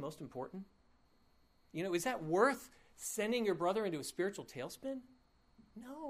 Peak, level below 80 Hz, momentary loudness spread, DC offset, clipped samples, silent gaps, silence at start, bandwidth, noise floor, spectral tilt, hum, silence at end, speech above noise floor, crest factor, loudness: -18 dBFS; -72 dBFS; 18 LU; under 0.1%; under 0.1%; none; 0 s; 15.5 kHz; -70 dBFS; -4.5 dB/octave; none; 0 s; 32 dB; 22 dB; -38 LUFS